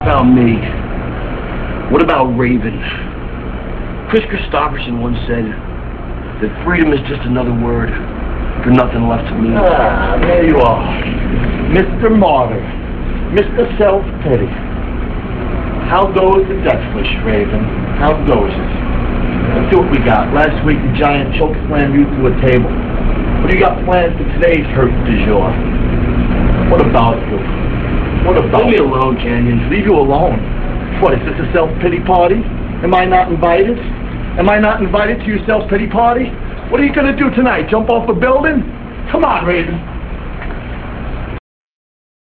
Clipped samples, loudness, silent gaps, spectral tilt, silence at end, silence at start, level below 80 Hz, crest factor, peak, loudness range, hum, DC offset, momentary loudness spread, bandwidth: under 0.1%; -13 LUFS; none; -9.5 dB/octave; 0.85 s; 0 s; -20 dBFS; 12 dB; 0 dBFS; 4 LU; none; 0.7%; 11 LU; 4.6 kHz